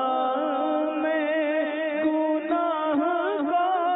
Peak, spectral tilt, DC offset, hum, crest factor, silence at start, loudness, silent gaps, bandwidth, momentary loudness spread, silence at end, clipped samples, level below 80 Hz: -14 dBFS; -8 dB/octave; under 0.1%; none; 10 dB; 0 s; -25 LUFS; none; 4 kHz; 2 LU; 0 s; under 0.1%; -74 dBFS